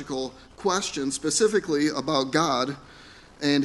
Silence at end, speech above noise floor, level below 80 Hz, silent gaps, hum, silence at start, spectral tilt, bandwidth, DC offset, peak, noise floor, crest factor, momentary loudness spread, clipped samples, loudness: 0 s; 24 dB; -58 dBFS; none; none; 0 s; -3.5 dB/octave; 11.5 kHz; under 0.1%; -6 dBFS; -49 dBFS; 20 dB; 10 LU; under 0.1%; -25 LUFS